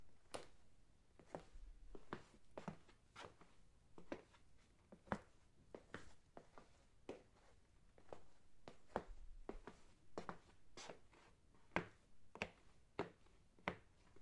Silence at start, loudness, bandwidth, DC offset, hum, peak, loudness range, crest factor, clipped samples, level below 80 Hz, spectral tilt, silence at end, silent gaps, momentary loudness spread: 0 s; -55 LUFS; 11 kHz; under 0.1%; none; -20 dBFS; 7 LU; 36 dB; under 0.1%; -68 dBFS; -5 dB/octave; 0 s; none; 15 LU